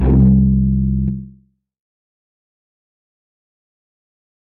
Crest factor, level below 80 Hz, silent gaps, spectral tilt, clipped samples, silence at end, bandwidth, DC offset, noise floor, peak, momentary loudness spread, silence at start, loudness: 14 dB; -24 dBFS; none; -14 dB/octave; under 0.1%; 3.25 s; 2.7 kHz; under 0.1%; -49 dBFS; -4 dBFS; 11 LU; 0 s; -15 LUFS